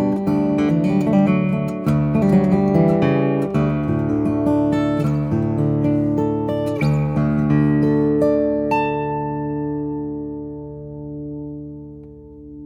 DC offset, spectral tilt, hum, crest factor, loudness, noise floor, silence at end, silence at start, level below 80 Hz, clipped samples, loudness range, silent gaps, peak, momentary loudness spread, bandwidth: under 0.1%; -9.5 dB/octave; none; 14 dB; -19 LUFS; -38 dBFS; 0 s; 0 s; -42 dBFS; under 0.1%; 8 LU; none; -4 dBFS; 15 LU; 8.4 kHz